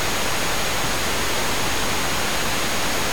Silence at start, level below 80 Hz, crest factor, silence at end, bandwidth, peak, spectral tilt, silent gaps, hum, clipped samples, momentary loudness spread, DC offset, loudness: 0 s; -38 dBFS; 12 dB; 0 s; over 20 kHz; -12 dBFS; -2 dB/octave; none; none; under 0.1%; 0 LU; 6%; -22 LUFS